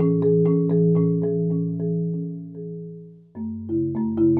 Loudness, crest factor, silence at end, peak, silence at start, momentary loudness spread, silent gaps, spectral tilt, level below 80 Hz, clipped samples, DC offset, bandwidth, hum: -22 LUFS; 12 dB; 0 s; -10 dBFS; 0 s; 16 LU; none; -15 dB/octave; -70 dBFS; under 0.1%; under 0.1%; 2.2 kHz; none